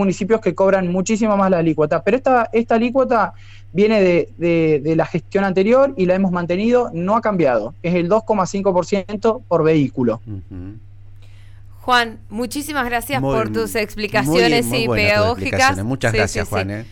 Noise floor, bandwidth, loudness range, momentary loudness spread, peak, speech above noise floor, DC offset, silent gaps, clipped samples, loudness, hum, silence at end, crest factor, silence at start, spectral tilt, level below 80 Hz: -38 dBFS; 16.5 kHz; 5 LU; 7 LU; -4 dBFS; 21 dB; under 0.1%; none; under 0.1%; -17 LUFS; none; 0.05 s; 12 dB; 0 s; -5.5 dB/octave; -40 dBFS